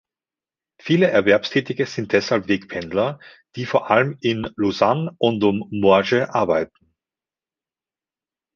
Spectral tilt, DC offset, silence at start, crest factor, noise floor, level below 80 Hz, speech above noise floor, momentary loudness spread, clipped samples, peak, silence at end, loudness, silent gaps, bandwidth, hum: -6 dB/octave; under 0.1%; 0.85 s; 20 dB; under -90 dBFS; -56 dBFS; over 71 dB; 9 LU; under 0.1%; -2 dBFS; 1.9 s; -20 LUFS; none; 7.2 kHz; none